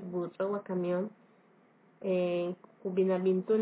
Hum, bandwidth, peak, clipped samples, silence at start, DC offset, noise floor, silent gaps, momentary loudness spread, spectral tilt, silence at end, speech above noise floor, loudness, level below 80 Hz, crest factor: none; 4 kHz; -18 dBFS; under 0.1%; 0 s; under 0.1%; -64 dBFS; none; 11 LU; -7.5 dB/octave; 0 s; 33 dB; -33 LUFS; -88 dBFS; 14 dB